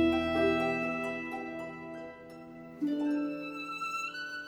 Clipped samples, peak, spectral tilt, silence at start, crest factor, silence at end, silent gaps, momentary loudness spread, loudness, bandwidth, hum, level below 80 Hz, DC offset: under 0.1%; -16 dBFS; -5.5 dB/octave; 0 s; 18 dB; 0 s; none; 18 LU; -33 LUFS; 18.5 kHz; none; -58 dBFS; under 0.1%